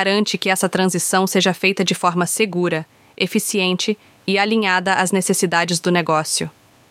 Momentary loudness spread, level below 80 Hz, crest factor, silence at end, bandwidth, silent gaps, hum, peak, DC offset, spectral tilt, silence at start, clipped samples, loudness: 5 LU; -66 dBFS; 18 dB; 0.4 s; 16.5 kHz; none; none; -2 dBFS; under 0.1%; -3.5 dB/octave; 0 s; under 0.1%; -18 LUFS